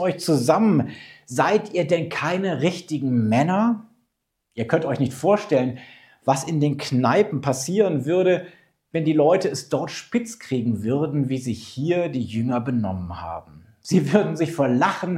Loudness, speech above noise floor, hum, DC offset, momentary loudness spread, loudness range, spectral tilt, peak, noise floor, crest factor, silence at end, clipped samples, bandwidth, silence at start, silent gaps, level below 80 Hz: -22 LUFS; 54 dB; none; under 0.1%; 11 LU; 3 LU; -6.5 dB/octave; -2 dBFS; -76 dBFS; 20 dB; 0 s; under 0.1%; 15 kHz; 0 s; none; -64 dBFS